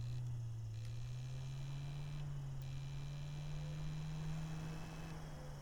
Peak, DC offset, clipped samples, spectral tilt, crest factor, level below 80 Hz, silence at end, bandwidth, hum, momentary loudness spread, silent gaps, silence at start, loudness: -34 dBFS; under 0.1%; under 0.1%; -6.5 dB/octave; 12 dB; -54 dBFS; 0 s; 19 kHz; none; 4 LU; none; 0 s; -47 LUFS